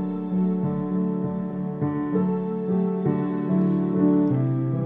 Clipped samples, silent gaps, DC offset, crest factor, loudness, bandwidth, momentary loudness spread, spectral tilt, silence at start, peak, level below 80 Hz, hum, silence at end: under 0.1%; none; under 0.1%; 14 dB; -24 LUFS; 3.7 kHz; 6 LU; -13 dB/octave; 0 s; -10 dBFS; -54 dBFS; none; 0 s